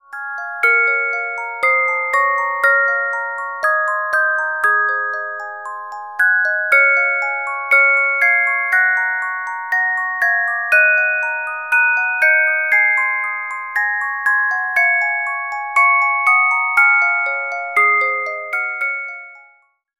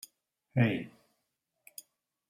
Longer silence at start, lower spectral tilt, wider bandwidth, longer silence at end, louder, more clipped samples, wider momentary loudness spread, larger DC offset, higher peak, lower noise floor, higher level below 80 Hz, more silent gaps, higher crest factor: second, 0.1 s vs 0.55 s; second, 0 dB/octave vs -7 dB/octave; about the same, 16 kHz vs 16 kHz; second, 0.6 s vs 1.4 s; first, -15 LUFS vs -31 LUFS; neither; second, 10 LU vs 21 LU; first, 0.1% vs under 0.1%; first, -2 dBFS vs -14 dBFS; second, -53 dBFS vs -82 dBFS; about the same, -74 dBFS vs -74 dBFS; neither; second, 16 dB vs 24 dB